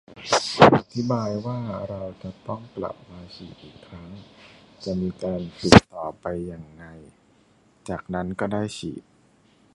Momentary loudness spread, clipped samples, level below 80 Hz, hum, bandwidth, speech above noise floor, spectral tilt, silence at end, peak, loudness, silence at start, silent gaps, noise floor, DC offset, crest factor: 27 LU; under 0.1%; -44 dBFS; none; 11.5 kHz; 34 dB; -5.5 dB/octave; 0.75 s; 0 dBFS; -23 LUFS; 0.1 s; none; -59 dBFS; under 0.1%; 24 dB